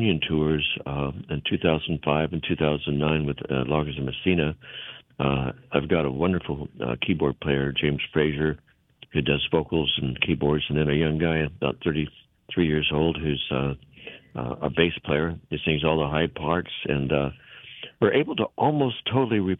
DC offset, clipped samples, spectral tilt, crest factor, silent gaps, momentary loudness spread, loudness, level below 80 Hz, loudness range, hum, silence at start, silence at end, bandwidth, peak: under 0.1%; under 0.1%; -9.5 dB/octave; 22 dB; none; 8 LU; -25 LUFS; -44 dBFS; 2 LU; none; 0 s; 0.05 s; 4 kHz; -4 dBFS